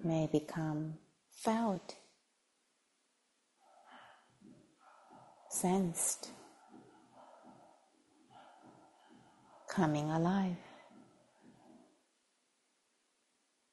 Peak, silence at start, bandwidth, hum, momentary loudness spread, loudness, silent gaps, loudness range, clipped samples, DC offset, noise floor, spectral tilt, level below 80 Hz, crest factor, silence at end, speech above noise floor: -18 dBFS; 0 s; 11.5 kHz; none; 26 LU; -36 LUFS; none; 9 LU; under 0.1%; under 0.1%; -79 dBFS; -5.5 dB/octave; -74 dBFS; 22 dB; 1.95 s; 44 dB